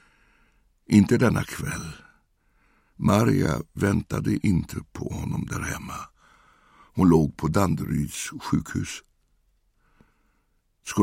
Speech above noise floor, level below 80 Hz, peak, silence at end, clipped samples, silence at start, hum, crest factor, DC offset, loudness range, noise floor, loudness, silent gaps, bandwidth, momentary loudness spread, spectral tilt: 45 dB; -46 dBFS; -4 dBFS; 0 s; under 0.1%; 0.9 s; none; 22 dB; under 0.1%; 5 LU; -69 dBFS; -25 LUFS; none; 16.5 kHz; 16 LU; -6.5 dB/octave